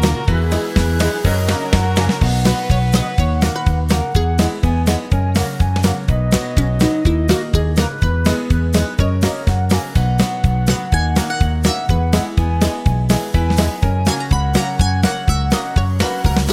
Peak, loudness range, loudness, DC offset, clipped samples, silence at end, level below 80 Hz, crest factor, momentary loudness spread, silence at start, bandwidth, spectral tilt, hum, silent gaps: 0 dBFS; 1 LU; -17 LUFS; under 0.1%; under 0.1%; 0 s; -22 dBFS; 14 dB; 2 LU; 0 s; 16.5 kHz; -6 dB/octave; none; none